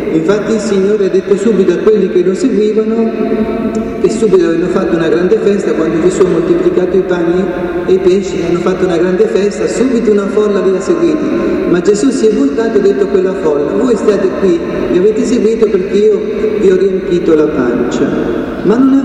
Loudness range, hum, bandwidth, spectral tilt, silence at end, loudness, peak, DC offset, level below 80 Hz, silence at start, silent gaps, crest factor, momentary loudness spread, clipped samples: 1 LU; none; 10.5 kHz; -6.5 dB/octave; 0 s; -11 LUFS; 0 dBFS; under 0.1%; -38 dBFS; 0 s; none; 10 dB; 4 LU; under 0.1%